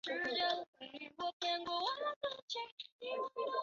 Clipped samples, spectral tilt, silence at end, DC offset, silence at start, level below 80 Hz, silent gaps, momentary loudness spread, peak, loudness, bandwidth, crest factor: under 0.1%; 1.5 dB/octave; 0 s; under 0.1%; 0.05 s; -82 dBFS; 0.67-0.73 s, 1.33-1.40 s, 2.16-2.21 s, 2.42-2.48 s, 2.72-2.77 s, 2.92-2.99 s; 12 LU; -24 dBFS; -40 LUFS; 7.6 kHz; 18 dB